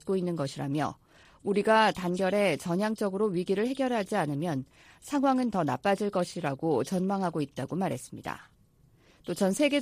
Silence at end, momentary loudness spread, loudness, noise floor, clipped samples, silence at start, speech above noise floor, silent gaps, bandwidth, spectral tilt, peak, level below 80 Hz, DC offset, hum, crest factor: 0 s; 12 LU; -29 LUFS; -62 dBFS; under 0.1%; 0.05 s; 34 dB; none; 15.5 kHz; -5.5 dB/octave; -10 dBFS; -64 dBFS; under 0.1%; none; 18 dB